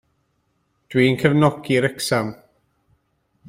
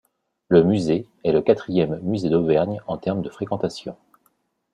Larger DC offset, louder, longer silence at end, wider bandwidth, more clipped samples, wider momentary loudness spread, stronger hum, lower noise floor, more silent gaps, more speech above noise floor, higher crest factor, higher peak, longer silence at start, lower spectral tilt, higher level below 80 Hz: neither; about the same, -19 LUFS vs -21 LUFS; first, 1.15 s vs 0.8 s; first, 16 kHz vs 10.5 kHz; neither; second, 7 LU vs 10 LU; neither; about the same, -68 dBFS vs -67 dBFS; neither; about the same, 50 dB vs 47 dB; about the same, 20 dB vs 20 dB; about the same, -2 dBFS vs -2 dBFS; first, 0.9 s vs 0.5 s; second, -6 dB/octave vs -8 dB/octave; about the same, -56 dBFS vs -56 dBFS